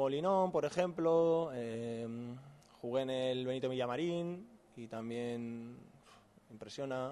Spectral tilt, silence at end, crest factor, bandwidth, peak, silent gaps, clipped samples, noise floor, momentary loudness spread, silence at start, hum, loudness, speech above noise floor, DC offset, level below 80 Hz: -6.5 dB/octave; 0 s; 16 dB; 12 kHz; -20 dBFS; none; under 0.1%; -63 dBFS; 17 LU; 0 s; none; -37 LUFS; 27 dB; under 0.1%; -76 dBFS